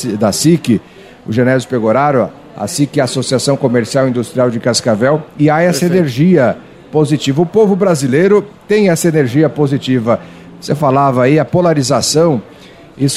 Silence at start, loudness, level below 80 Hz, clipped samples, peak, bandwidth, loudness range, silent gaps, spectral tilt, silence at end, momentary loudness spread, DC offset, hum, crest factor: 0 s; -12 LUFS; -50 dBFS; under 0.1%; 0 dBFS; 15.5 kHz; 2 LU; none; -5.5 dB/octave; 0 s; 6 LU; under 0.1%; none; 12 dB